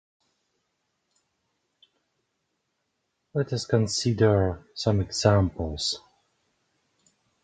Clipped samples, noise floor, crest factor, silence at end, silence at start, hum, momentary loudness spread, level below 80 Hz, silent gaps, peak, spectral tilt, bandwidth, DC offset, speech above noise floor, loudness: under 0.1%; -78 dBFS; 24 dB; 1.45 s; 3.35 s; none; 8 LU; -46 dBFS; none; -6 dBFS; -5.5 dB/octave; 9.4 kHz; under 0.1%; 54 dB; -25 LUFS